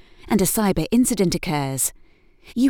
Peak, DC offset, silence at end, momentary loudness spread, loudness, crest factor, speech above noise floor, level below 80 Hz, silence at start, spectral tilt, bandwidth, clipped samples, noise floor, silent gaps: -6 dBFS; under 0.1%; 0 s; 6 LU; -21 LUFS; 16 dB; 30 dB; -40 dBFS; 0.25 s; -4.5 dB/octave; over 20 kHz; under 0.1%; -50 dBFS; none